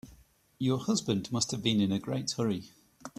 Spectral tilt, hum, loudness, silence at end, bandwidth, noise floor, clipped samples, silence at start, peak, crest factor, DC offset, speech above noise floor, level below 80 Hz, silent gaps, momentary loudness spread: -5 dB/octave; none; -31 LUFS; 0.1 s; 14 kHz; -60 dBFS; under 0.1%; 0.05 s; -14 dBFS; 18 dB; under 0.1%; 30 dB; -64 dBFS; none; 6 LU